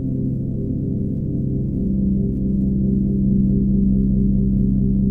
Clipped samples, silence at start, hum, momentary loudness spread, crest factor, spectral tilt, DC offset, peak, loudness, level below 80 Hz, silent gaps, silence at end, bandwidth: under 0.1%; 0 s; none; 6 LU; 12 dB; -14.5 dB/octave; under 0.1%; -6 dBFS; -20 LUFS; -26 dBFS; none; 0 s; 0.8 kHz